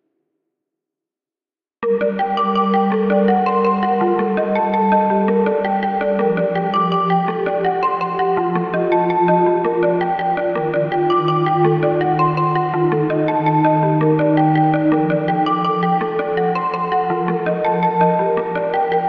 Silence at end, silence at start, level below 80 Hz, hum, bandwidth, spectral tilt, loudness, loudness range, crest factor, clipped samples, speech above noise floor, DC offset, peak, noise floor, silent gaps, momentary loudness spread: 0 s; 1.8 s; -56 dBFS; none; 5.8 kHz; -9.5 dB/octave; -17 LUFS; 2 LU; 14 dB; under 0.1%; over 74 dB; under 0.1%; -2 dBFS; under -90 dBFS; none; 4 LU